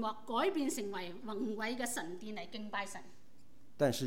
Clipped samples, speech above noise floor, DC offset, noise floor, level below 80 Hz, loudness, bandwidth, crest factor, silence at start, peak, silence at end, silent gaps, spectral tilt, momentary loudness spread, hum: under 0.1%; 28 dB; 0.5%; -66 dBFS; -76 dBFS; -38 LUFS; 17 kHz; 20 dB; 0 s; -20 dBFS; 0 s; none; -4 dB/octave; 10 LU; none